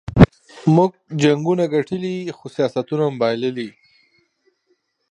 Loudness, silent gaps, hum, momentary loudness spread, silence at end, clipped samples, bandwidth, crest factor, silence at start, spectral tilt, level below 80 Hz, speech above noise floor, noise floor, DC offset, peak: -19 LUFS; none; none; 12 LU; 1.4 s; under 0.1%; 9.4 kHz; 20 dB; 0.1 s; -7.5 dB/octave; -36 dBFS; 48 dB; -67 dBFS; under 0.1%; 0 dBFS